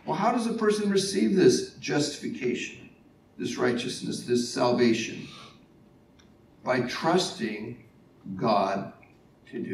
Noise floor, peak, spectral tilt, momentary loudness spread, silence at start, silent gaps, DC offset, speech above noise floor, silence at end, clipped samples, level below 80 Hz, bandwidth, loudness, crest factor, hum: -57 dBFS; -8 dBFS; -4.5 dB/octave; 18 LU; 0.05 s; none; under 0.1%; 30 dB; 0 s; under 0.1%; -68 dBFS; 13 kHz; -27 LUFS; 20 dB; none